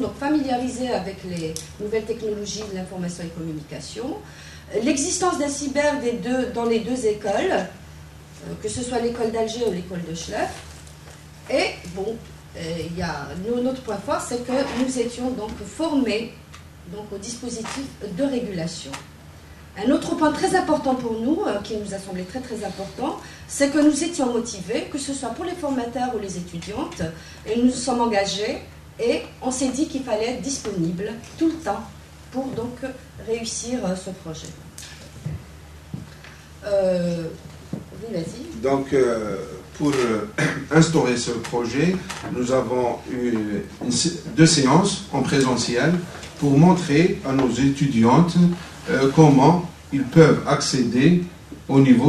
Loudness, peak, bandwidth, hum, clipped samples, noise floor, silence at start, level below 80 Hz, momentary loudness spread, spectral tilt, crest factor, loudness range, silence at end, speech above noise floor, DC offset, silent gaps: -22 LUFS; 0 dBFS; 13.5 kHz; none; under 0.1%; -43 dBFS; 0 s; -48 dBFS; 18 LU; -5.5 dB/octave; 22 dB; 11 LU; 0 s; 21 dB; under 0.1%; none